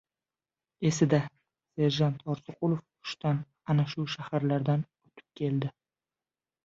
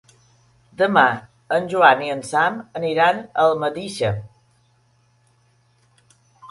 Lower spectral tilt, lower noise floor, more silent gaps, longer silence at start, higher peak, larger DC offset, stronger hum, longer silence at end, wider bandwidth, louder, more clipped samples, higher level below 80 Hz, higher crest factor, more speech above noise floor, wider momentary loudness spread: first, -6.5 dB/octave vs -5 dB/octave; first, under -90 dBFS vs -60 dBFS; neither; about the same, 0.8 s vs 0.8 s; second, -12 dBFS vs 0 dBFS; neither; neither; first, 0.95 s vs 0.05 s; second, 7.8 kHz vs 11.5 kHz; second, -30 LUFS vs -19 LUFS; neither; second, -68 dBFS vs -58 dBFS; about the same, 20 dB vs 22 dB; first, over 61 dB vs 42 dB; about the same, 11 LU vs 10 LU